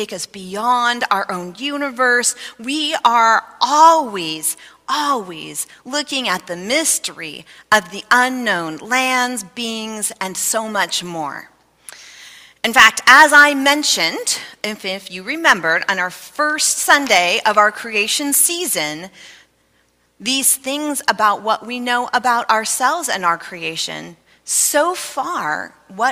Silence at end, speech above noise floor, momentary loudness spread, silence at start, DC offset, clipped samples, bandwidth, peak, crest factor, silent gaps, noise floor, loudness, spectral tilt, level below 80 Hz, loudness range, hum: 0 s; 43 dB; 14 LU; 0 s; under 0.1%; 0.2%; 16 kHz; 0 dBFS; 18 dB; none; -60 dBFS; -16 LUFS; -1 dB/octave; -62 dBFS; 7 LU; none